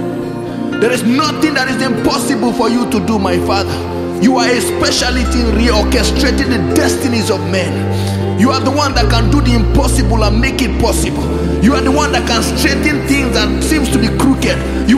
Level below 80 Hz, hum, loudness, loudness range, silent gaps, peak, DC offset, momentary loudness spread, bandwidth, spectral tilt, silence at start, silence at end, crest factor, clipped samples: -20 dBFS; none; -13 LUFS; 1 LU; none; 0 dBFS; under 0.1%; 4 LU; 15.5 kHz; -5 dB/octave; 0 s; 0 s; 12 dB; under 0.1%